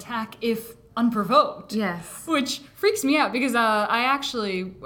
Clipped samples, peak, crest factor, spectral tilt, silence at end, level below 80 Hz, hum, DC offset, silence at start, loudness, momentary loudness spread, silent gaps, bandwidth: under 0.1%; -4 dBFS; 20 dB; -4 dB/octave; 0 s; -60 dBFS; none; under 0.1%; 0 s; -23 LUFS; 9 LU; none; 18 kHz